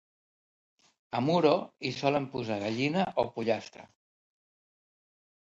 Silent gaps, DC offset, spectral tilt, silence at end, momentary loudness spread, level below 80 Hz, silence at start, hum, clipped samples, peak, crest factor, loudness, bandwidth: none; under 0.1%; -6.5 dB/octave; 1.6 s; 9 LU; -70 dBFS; 1.15 s; none; under 0.1%; -10 dBFS; 22 dB; -30 LUFS; 8 kHz